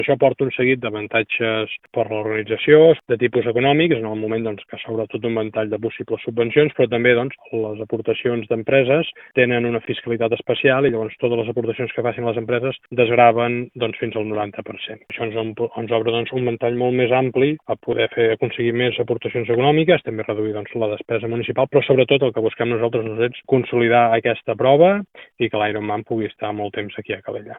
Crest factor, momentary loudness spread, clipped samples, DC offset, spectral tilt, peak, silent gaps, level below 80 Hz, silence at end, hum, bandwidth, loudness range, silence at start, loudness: 18 dB; 11 LU; under 0.1%; under 0.1%; -10 dB/octave; 0 dBFS; none; -60 dBFS; 0 s; none; 4 kHz; 3 LU; 0 s; -19 LUFS